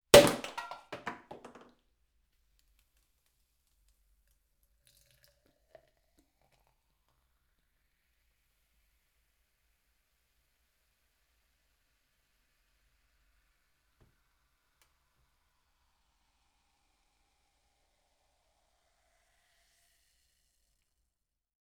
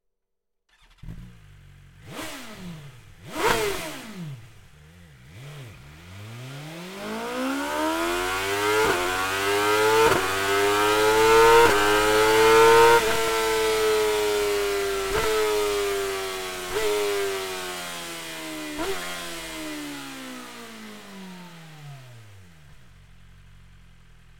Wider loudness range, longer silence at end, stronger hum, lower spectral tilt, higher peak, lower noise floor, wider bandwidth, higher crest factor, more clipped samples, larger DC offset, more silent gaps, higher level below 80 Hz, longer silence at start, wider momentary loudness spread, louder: first, 30 LU vs 21 LU; first, 20.5 s vs 1.2 s; neither; about the same, -3 dB/octave vs -3 dB/octave; about the same, -6 dBFS vs -4 dBFS; first, -85 dBFS vs -78 dBFS; about the same, 17.5 kHz vs 17 kHz; first, 32 dB vs 22 dB; neither; neither; neither; second, -62 dBFS vs -48 dBFS; second, 0.15 s vs 1.05 s; first, 28 LU vs 24 LU; about the same, -24 LUFS vs -22 LUFS